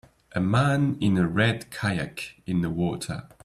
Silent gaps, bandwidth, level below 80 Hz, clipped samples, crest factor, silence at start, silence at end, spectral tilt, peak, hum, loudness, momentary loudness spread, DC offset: none; 13.5 kHz; -52 dBFS; under 0.1%; 16 dB; 0.35 s; 0.2 s; -6.5 dB/octave; -10 dBFS; none; -26 LUFS; 12 LU; under 0.1%